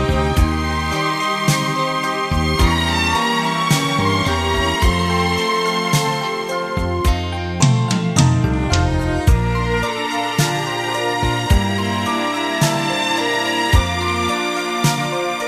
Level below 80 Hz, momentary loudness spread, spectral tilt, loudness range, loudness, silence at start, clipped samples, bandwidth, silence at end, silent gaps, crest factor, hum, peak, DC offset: -26 dBFS; 4 LU; -4.5 dB/octave; 2 LU; -18 LUFS; 0 s; under 0.1%; 15.5 kHz; 0 s; none; 16 dB; none; 0 dBFS; under 0.1%